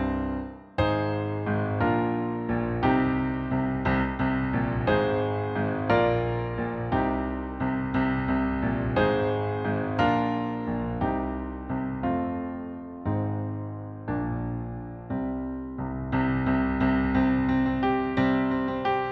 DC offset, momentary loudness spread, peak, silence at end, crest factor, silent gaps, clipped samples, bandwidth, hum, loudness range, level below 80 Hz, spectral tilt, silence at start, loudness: under 0.1%; 9 LU; -10 dBFS; 0 s; 16 dB; none; under 0.1%; 5.8 kHz; none; 6 LU; -42 dBFS; -9.5 dB/octave; 0 s; -27 LUFS